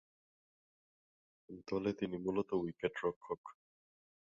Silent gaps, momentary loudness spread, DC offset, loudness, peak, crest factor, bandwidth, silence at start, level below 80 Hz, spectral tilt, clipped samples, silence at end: 3.16-3.21 s, 3.38-3.44 s; 15 LU; under 0.1%; -40 LUFS; -20 dBFS; 22 dB; 7.4 kHz; 1.5 s; -72 dBFS; -5.5 dB/octave; under 0.1%; 0.8 s